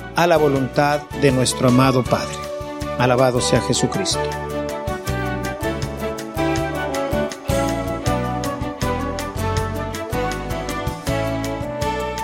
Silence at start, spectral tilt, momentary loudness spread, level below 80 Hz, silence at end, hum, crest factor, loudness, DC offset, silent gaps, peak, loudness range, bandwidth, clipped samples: 0 s; -5 dB/octave; 10 LU; -34 dBFS; 0 s; none; 20 dB; -21 LUFS; under 0.1%; none; 0 dBFS; 6 LU; 16.5 kHz; under 0.1%